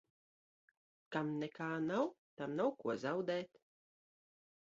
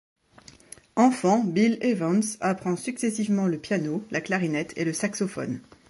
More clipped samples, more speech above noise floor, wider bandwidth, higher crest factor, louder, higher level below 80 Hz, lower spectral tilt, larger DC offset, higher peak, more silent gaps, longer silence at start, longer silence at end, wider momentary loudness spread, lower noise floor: neither; first, over 51 dB vs 28 dB; second, 7.6 kHz vs 11.5 kHz; about the same, 20 dB vs 18 dB; second, -40 LUFS vs -25 LUFS; second, -84 dBFS vs -66 dBFS; about the same, -5 dB/octave vs -5.5 dB/octave; neither; second, -22 dBFS vs -8 dBFS; first, 2.18-2.37 s vs none; first, 1.1 s vs 0.95 s; first, 1.3 s vs 0.3 s; about the same, 6 LU vs 8 LU; first, under -90 dBFS vs -53 dBFS